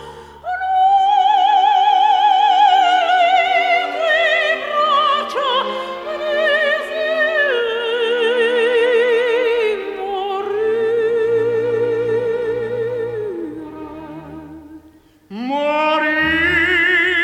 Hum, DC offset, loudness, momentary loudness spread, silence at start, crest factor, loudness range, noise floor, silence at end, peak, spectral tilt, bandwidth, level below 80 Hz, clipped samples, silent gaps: none; under 0.1%; -16 LUFS; 13 LU; 0 s; 14 dB; 9 LU; -48 dBFS; 0 s; -4 dBFS; -4 dB/octave; 12 kHz; -52 dBFS; under 0.1%; none